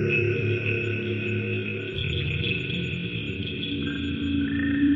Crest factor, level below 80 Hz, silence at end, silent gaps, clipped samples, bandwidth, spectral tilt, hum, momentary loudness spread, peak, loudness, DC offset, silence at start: 14 dB; -48 dBFS; 0 s; none; under 0.1%; 7.4 kHz; -7.5 dB/octave; none; 6 LU; -12 dBFS; -27 LUFS; under 0.1%; 0 s